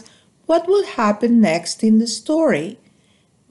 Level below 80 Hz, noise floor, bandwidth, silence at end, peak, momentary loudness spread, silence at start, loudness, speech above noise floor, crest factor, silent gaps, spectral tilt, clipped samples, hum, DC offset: -62 dBFS; -58 dBFS; 11.5 kHz; 0.75 s; -6 dBFS; 6 LU; 0.5 s; -17 LUFS; 41 dB; 14 dB; none; -5 dB/octave; under 0.1%; none; under 0.1%